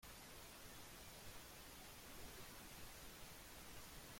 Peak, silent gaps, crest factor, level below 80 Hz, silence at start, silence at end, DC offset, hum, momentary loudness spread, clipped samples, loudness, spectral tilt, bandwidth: -42 dBFS; none; 14 dB; -66 dBFS; 0 s; 0 s; under 0.1%; none; 1 LU; under 0.1%; -57 LUFS; -2.5 dB/octave; 16.5 kHz